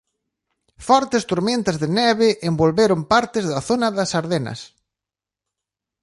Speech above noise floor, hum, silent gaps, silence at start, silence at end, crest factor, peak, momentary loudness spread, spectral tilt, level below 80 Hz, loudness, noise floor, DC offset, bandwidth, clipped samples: 69 dB; none; none; 0.8 s; 1.35 s; 18 dB; -2 dBFS; 8 LU; -5 dB/octave; -52 dBFS; -19 LUFS; -88 dBFS; under 0.1%; 11.5 kHz; under 0.1%